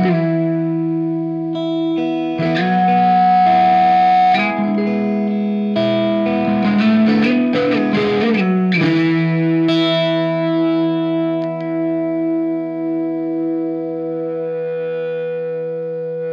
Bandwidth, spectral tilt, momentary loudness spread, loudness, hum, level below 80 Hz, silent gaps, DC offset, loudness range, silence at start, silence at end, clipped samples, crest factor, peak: 7 kHz; -8 dB/octave; 10 LU; -17 LUFS; none; -60 dBFS; none; under 0.1%; 7 LU; 0 s; 0 s; under 0.1%; 12 dB; -4 dBFS